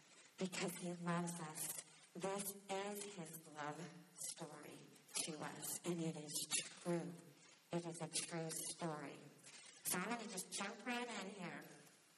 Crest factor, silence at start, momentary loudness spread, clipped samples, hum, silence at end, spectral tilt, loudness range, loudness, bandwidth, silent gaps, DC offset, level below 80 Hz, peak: 24 dB; 0 s; 15 LU; under 0.1%; none; 0 s; -3.5 dB/octave; 3 LU; -46 LUFS; 13.5 kHz; none; under 0.1%; under -90 dBFS; -24 dBFS